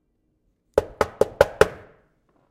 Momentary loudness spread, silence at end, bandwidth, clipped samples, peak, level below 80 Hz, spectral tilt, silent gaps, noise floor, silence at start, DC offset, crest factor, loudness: 7 LU; 0.75 s; 16.5 kHz; under 0.1%; 0 dBFS; -44 dBFS; -4.5 dB/octave; none; -69 dBFS; 0.75 s; under 0.1%; 24 dB; -22 LUFS